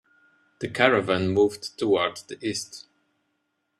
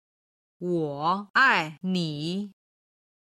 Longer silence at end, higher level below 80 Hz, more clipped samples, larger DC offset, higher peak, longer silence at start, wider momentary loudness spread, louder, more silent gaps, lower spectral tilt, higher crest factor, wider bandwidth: first, 1 s vs 0.85 s; first, -64 dBFS vs -72 dBFS; neither; neither; first, -2 dBFS vs -8 dBFS; about the same, 0.6 s vs 0.6 s; about the same, 14 LU vs 14 LU; about the same, -24 LUFS vs -25 LUFS; second, none vs 1.30-1.34 s; about the same, -4.5 dB/octave vs -5.5 dB/octave; about the same, 24 dB vs 20 dB; about the same, 13 kHz vs 12.5 kHz